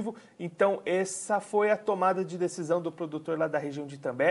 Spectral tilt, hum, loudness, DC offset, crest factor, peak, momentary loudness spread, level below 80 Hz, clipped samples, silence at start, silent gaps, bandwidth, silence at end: -5 dB/octave; none; -29 LUFS; under 0.1%; 18 dB; -12 dBFS; 10 LU; -80 dBFS; under 0.1%; 0 s; none; 11.5 kHz; 0 s